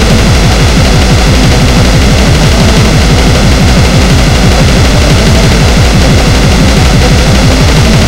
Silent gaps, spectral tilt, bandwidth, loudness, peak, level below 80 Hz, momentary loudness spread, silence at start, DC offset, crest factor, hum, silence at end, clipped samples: none; -5 dB/octave; 16.5 kHz; -5 LUFS; 0 dBFS; -8 dBFS; 1 LU; 0 s; under 0.1%; 4 dB; none; 0 s; 6%